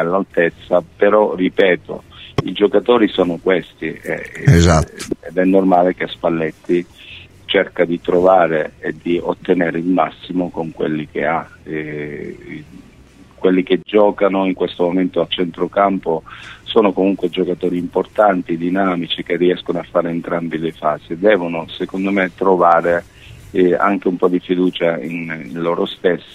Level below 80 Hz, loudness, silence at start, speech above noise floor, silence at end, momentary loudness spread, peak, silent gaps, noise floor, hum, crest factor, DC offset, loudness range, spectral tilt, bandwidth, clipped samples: -40 dBFS; -17 LUFS; 0 s; 28 dB; 0.1 s; 11 LU; 0 dBFS; none; -44 dBFS; none; 16 dB; under 0.1%; 4 LU; -6.5 dB/octave; 13 kHz; under 0.1%